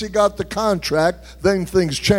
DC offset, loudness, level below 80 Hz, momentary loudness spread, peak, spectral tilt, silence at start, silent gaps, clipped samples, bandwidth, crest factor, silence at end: under 0.1%; -19 LUFS; -40 dBFS; 4 LU; -2 dBFS; -5 dB/octave; 0 s; none; under 0.1%; 16.5 kHz; 18 dB; 0 s